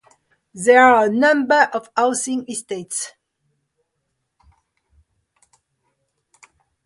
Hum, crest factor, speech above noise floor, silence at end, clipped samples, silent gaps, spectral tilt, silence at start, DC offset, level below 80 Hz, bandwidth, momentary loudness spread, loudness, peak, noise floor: none; 20 dB; 58 dB; 3.75 s; under 0.1%; none; -3 dB/octave; 0.55 s; under 0.1%; -64 dBFS; 11.5 kHz; 15 LU; -17 LUFS; 0 dBFS; -75 dBFS